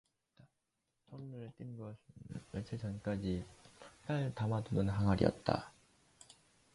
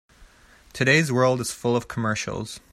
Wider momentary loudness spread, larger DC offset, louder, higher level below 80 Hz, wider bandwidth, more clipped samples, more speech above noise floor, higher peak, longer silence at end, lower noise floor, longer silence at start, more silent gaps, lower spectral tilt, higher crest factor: first, 23 LU vs 12 LU; neither; second, -38 LUFS vs -23 LUFS; about the same, -58 dBFS vs -54 dBFS; second, 11.5 kHz vs 14.5 kHz; neither; first, 48 dB vs 30 dB; second, -16 dBFS vs -6 dBFS; first, 1.05 s vs 0.15 s; first, -85 dBFS vs -53 dBFS; first, 1.1 s vs 0.2 s; neither; first, -7.5 dB/octave vs -4.5 dB/octave; about the same, 24 dB vs 20 dB